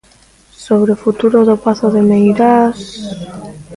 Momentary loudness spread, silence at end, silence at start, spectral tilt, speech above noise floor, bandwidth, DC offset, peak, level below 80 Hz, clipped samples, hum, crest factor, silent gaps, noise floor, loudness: 16 LU; 0 s; 0.6 s; -7.5 dB/octave; 35 dB; 11.5 kHz; under 0.1%; 0 dBFS; -48 dBFS; under 0.1%; none; 12 dB; none; -47 dBFS; -11 LUFS